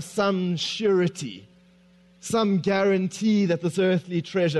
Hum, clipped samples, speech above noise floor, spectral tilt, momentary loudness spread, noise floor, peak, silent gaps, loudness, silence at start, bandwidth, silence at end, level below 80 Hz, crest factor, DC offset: none; under 0.1%; 33 dB; -6 dB/octave; 9 LU; -56 dBFS; -10 dBFS; none; -24 LUFS; 0 s; 12 kHz; 0 s; -66 dBFS; 14 dB; under 0.1%